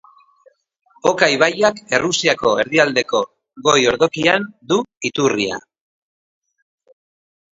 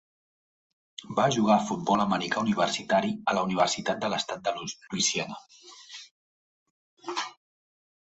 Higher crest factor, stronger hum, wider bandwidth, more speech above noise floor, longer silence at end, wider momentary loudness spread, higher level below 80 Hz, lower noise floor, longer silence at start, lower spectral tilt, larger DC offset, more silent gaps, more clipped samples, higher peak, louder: about the same, 20 dB vs 22 dB; neither; about the same, 8 kHz vs 8.2 kHz; second, 40 dB vs over 63 dB; first, 2 s vs 0.85 s; second, 7 LU vs 20 LU; first, -56 dBFS vs -66 dBFS; second, -57 dBFS vs under -90 dBFS; about the same, 1.05 s vs 1 s; about the same, -3 dB/octave vs -3.5 dB/octave; neither; second, 4.97-5.01 s vs 6.11-6.97 s; neither; first, 0 dBFS vs -8 dBFS; first, -17 LUFS vs -27 LUFS